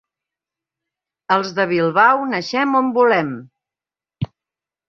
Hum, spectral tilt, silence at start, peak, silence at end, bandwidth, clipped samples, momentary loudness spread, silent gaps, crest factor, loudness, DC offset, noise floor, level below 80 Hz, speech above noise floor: none; -6 dB/octave; 1.3 s; -2 dBFS; 0.65 s; 7.2 kHz; under 0.1%; 16 LU; none; 18 dB; -17 LUFS; under 0.1%; under -90 dBFS; -58 dBFS; over 73 dB